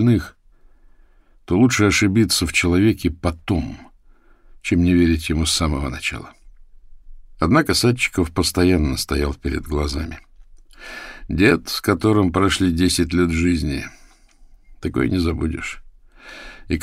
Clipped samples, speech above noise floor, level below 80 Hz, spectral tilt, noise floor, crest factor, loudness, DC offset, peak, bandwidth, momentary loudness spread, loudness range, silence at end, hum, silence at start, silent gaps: under 0.1%; 33 dB; -32 dBFS; -5 dB/octave; -51 dBFS; 18 dB; -19 LUFS; under 0.1%; -2 dBFS; 16 kHz; 18 LU; 4 LU; 0 s; none; 0 s; none